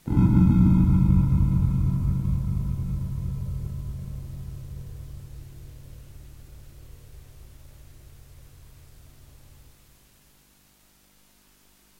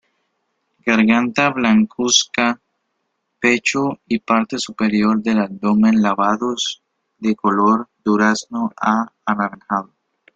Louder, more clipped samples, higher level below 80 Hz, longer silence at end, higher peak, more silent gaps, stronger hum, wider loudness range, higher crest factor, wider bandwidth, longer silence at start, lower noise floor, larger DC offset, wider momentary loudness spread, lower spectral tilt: second, -23 LUFS vs -17 LUFS; neither; first, -34 dBFS vs -60 dBFS; first, 4.35 s vs 0.5 s; second, -8 dBFS vs 0 dBFS; neither; first, 50 Hz at -50 dBFS vs none; first, 27 LU vs 2 LU; about the same, 18 dB vs 18 dB; first, 16 kHz vs 7.8 kHz; second, 0.05 s vs 0.85 s; second, -60 dBFS vs -72 dBFS; neither; first, 26 LU vs 9 LU; first, -9.5 dB/octave vs -4 dB/octave